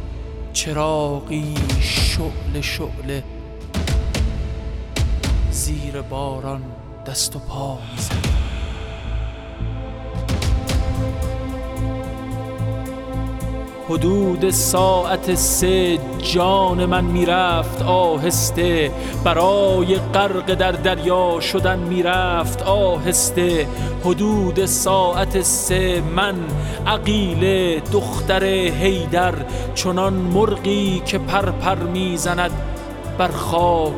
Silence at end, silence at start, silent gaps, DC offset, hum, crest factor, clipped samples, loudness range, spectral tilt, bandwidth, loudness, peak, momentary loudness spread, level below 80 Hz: 0 s; 0 s; none; under 0.1%; none; 16 dB; under 0.1%; 8 LU; -4.5 dB/octave; 18 kHz; -19 LUFS; -2 dBFS; 12 LU; -28 dBFS